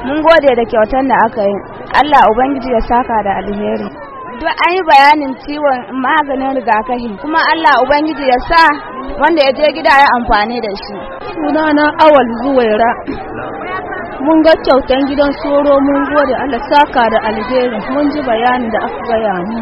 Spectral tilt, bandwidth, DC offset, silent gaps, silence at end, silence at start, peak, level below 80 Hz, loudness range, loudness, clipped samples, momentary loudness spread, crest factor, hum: -6 dB/octave; 10.5 kHz; under 0.1%; none; 0 s; 0 s; 0 dBFS; -34 dBFS; 2 LU; -11 LUFS; 0.3%; 13 LU; 12 dB; none